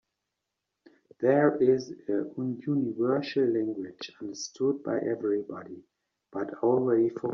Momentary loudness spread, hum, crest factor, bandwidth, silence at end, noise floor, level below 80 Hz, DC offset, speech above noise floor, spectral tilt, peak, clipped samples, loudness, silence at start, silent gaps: 16 LU; none; 20 dB; 7.4 kHz; 0 s; -85 dBFS; -74 dBFS; under 0.1%; 57 dB; -6 dB/octave; -10 dBFS; under 0.1%; -28 LUFS; 1.2 s; none